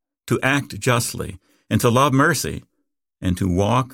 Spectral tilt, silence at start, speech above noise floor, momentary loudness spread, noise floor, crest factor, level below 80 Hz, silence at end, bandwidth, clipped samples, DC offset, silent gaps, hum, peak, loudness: -5 dB/octave; 0.25 s; 56 dB; 12 LU; -75 dBFS; 18 dB; -46 dBFS; 0 s; 18 kHz; under 0.1%; under 0.1%; none; none; -4 dBFS; -20 LUFS